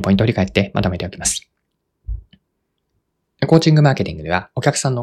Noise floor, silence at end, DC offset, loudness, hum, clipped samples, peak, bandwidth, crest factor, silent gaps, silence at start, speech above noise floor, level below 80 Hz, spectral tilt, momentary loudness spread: -72 dBFS; 0 s; under 0.1%; -17 LUFS; none; under 0.1%; 0 dBFS; 13 kHz; 18 dB; none; 0 s; 56 dB; -38 dBFS; -5.5 dB/octave; 18 LU